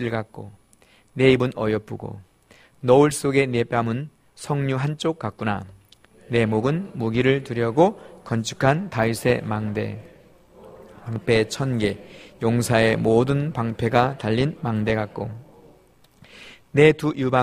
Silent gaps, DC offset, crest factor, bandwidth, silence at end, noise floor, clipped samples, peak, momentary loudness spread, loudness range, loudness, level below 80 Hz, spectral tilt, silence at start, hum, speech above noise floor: none; under 0.1%; 20 dB; 15.5 kHz; 0 s; -56 dBFS; under 0.1%; -2 dBFS; 17 LU; 4 LU; -22 LUFS; -50 dBFS; -6 dB/octave; 0 s; none; 35 dB